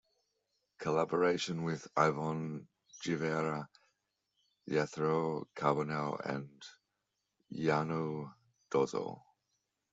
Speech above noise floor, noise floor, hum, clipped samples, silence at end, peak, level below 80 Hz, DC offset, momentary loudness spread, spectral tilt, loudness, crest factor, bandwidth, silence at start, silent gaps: 51 dB; -86 dBFS; none; under 0.1%; 0.75 s; -14 dBFS; -76 dBFS; under 0.1%; 17 LU; -6 dB/octave; -35 LUFS; 24 dB; 8 kHz; 0.8 s; none